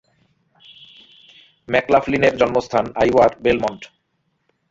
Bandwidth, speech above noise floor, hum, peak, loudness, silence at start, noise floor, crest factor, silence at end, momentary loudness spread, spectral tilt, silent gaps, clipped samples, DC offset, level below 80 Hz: 7.8 kHz; 52 dB; none; -2 dBFS; -18 LUFS; 1.7 s; -69 dBFS; 18 dB; 0.85 s; 7 LU; -6 dB/octave; none; under 0.1%; under 0.1%; -48 dBFS